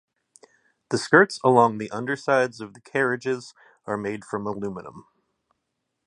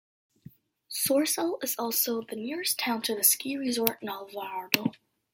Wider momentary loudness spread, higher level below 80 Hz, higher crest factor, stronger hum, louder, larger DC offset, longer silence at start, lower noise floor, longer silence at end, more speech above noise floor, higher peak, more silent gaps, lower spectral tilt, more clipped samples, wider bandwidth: about the same, 15 LU vs 14 LU; first, -66 dBFS vs -74 dBFS; second, 24 dB vs 30 dB; neither; first, -23 LUFS vs -28 LUFS; neither; about the same, 0.9 s vs 0.9 s; first, -79 dBFS vs -54 dBFS; first, 1.05 s vs 0.4 s; first, 56 dB vs 25 dB; about the same, -2 dBFS vs 0 dBFS; neither; first, -5.5 dB/octave vs -2 dB/octave; neither; second, 11 kHz vs 16.5 kHz